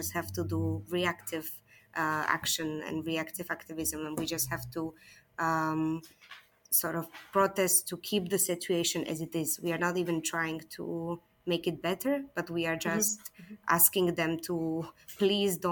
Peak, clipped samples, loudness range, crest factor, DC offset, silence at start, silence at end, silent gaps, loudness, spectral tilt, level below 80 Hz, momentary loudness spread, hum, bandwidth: -8 dBFS; under 0.1%; 5 LU; 24 dB; under 0.1%; 0 s; 0 s; none; -31 LUFS; -3.5 dB/octave; -64 dBFS; 12 LU; none; 18 kHz